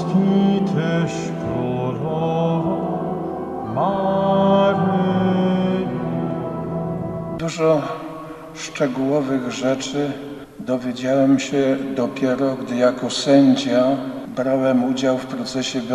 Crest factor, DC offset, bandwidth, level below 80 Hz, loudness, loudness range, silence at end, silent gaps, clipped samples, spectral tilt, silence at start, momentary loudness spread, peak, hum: 16 dB; under 0.1%; 12.5 kHz; -52 dBFS; -20 LUFS; 5 LU; 0 s; none; under 0.1%; -6.5 dB/octave; 0 s; 10 LU; -4 dBFS; none